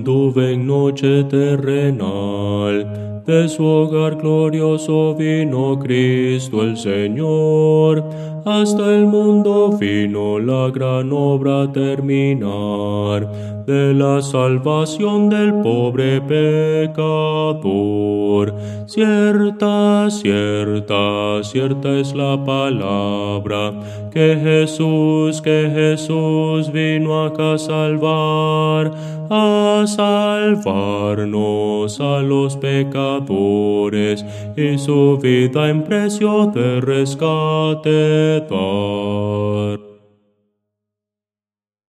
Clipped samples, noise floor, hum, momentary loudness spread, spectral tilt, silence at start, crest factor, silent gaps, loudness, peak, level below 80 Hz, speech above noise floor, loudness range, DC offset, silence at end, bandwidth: under 0.1%; under -90 dBFS; none; 6 LU; -7 dB/octave; 0 s; 14 dB; none; -16 LUFS; 0 dBFS; -60 dBFS; over 74 dB; 3 LU; under 0.1%; 1.95 s; 12.5 kHz